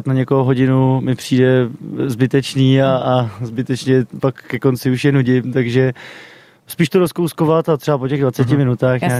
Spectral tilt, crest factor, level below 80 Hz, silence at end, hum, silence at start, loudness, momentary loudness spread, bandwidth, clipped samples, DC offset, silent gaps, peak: -7 dB/octave; 14 dB; -50 dBFS; 0 s; none; 0 s; -16 LUFS; 8 LU; 14.5 kHz; under 0.1%; under 0.1%; none; -2 dBFS